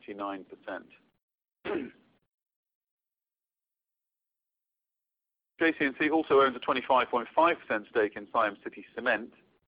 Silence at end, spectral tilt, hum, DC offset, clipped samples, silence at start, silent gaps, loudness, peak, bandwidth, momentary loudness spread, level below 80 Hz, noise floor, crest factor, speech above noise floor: 0.4 s; -8 dB/octave; none; under 0.1%; under 0.1%; 0.1 s; 1.23-1.28 s, 2.56-2.63 s, 2.75-2.81 s, 2.91-2.98 s; -28 LUFS; -12 dBFS; 5.2 kHz; 18 LU; -72 dBFS; under -90 dBFS; 20 dB; over 61 dB